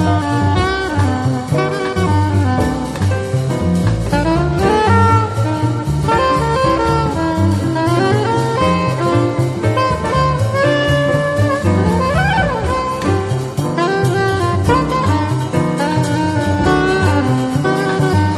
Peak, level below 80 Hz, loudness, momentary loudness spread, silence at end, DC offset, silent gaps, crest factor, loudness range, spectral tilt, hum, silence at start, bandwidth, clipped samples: 0 dBFS; -30 dBFS; -15 LUFS; 4 LU; 0 s; under 0.1%; none; 14 dB; 2 LU; -6.5 dB/octave; none; 0 s; 13 kHz; under 0.1%